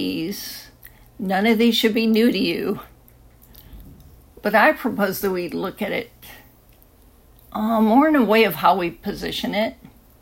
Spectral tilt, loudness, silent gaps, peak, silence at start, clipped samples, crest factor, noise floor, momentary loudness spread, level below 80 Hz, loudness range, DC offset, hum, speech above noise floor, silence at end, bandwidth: -5 dB/octave; -20 LUFS; none; -2 dBFS; 0 s; under 0.1%; 20 dB; -52 dBFS; 13 LU; -50 dBFS; 3 LU; under 0.1%; none; 32 dB; 0.35 s; 16.5 kHz